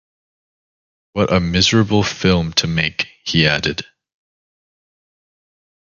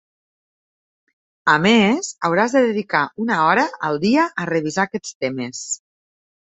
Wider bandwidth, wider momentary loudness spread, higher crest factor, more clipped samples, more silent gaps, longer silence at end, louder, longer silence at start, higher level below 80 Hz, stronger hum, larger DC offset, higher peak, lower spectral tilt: second, 7.4 kHz vs 8.4 kHz; about the same, 9 LU vs 11 LU; about the same, 20 dB vs 18 dB; neither; second, none vs 5.15-5.21 s; first, 2 s vs 0.75 s; first, -16 LUFS vs -19 LUFS; second, 1.15 s vs 1.45 s; first, -38 dBFS vs -62 dBFS; neither; neither; about the same, 0 dBFS vs -2 dBFS; about the same, -4.5 dB/octave vs -4 dB/octave